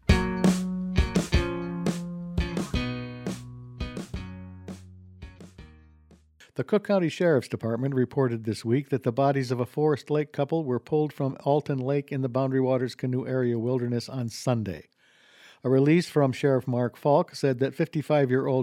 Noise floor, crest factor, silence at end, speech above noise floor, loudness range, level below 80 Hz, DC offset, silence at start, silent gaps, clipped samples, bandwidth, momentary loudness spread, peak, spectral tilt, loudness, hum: -58 dBFS; 20 dB; 0 s; 33 dB; 9 LU; -40 dBFS; under 0.1%; 0.1 s; none; under 0.1%; 15.5 kHz; 13 LU; -6 dBFS; -7 dB/octave; -27 LUFS; none